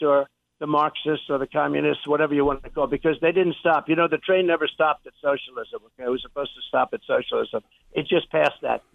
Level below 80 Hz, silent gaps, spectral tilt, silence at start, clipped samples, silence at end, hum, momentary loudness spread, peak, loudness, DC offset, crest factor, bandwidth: -52 dBFS; none; -7 dB/octave; 0 s; under 0.1%; 0.15 s; none; 11 LU; -6 dBFS; -23 LUFS; under 0.1%; 18 dB; 7 kHz